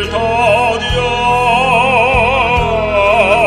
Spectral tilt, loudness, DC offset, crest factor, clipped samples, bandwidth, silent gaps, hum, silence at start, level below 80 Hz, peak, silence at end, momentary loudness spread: -4.5 dB/octave; -11 LUFS; under 0.1%; 12 dB; under 0.1%; 13 kHz; none; none; 0 s; -28 dBFS; 0 dBFS; 0 s; 4 LU